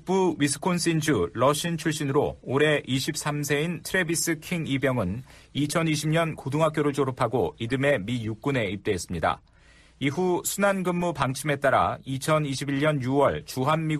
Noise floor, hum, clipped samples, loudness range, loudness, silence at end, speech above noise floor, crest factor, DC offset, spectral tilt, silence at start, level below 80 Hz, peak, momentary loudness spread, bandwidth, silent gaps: -55 dBFS; none; under 0.1%; 2 LU; -26 LUFS; 0 s; 30 dB; 16 dB; under 0.1%; -5 dB/octave; 0 s; -54 dBFS; -10 dBFS; 6 LU; 14.5 kHz; none